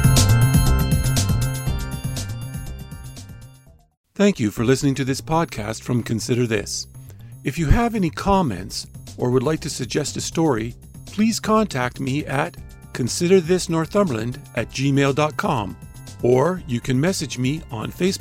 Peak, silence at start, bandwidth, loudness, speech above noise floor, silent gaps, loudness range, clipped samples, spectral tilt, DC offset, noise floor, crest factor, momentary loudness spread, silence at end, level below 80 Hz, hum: -2 dBFS; 0 s; 16 kHz; -21 LUFS; 28 dB; 3.97-4.04 s; 3 LU; under 0.1%; -5.5 dB/octave; under 0.1%; -49 dBFS; 18 dB; 15 LU; 0 s; -32 dBFS; none